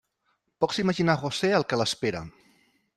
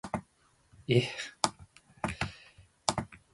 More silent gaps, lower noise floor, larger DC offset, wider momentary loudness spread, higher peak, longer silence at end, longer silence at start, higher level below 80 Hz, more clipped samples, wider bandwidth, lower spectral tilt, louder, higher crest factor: neither; first, -74 dBFS vs -68 dBFS; neither; second, 8 LU vs 12 LU; about the same, -8 dBFS vs -6 dBFS; first, 0.65 s vs 0.15 s; first, 0.6 s vs 0.05 s; about the same, -60 dBFS vs -56 dBFS; neither; first, 13 kHz vs 11.5 kHz; about the same, -5 dB/octave vs -4.5 dB/octave; first, -26 LUFS vs -34 LUFS; second, 20 dB vs 28 dB